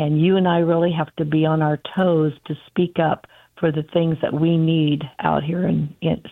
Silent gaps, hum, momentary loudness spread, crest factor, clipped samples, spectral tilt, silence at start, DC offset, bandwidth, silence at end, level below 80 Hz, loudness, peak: none; none; 7 LU; 18 dB; under 0.1%; -10 dB/octave; 0 s; under 0.1%; 4 kHz; 0 s; -54 dBFS; -20 LUFS; -2 dBFS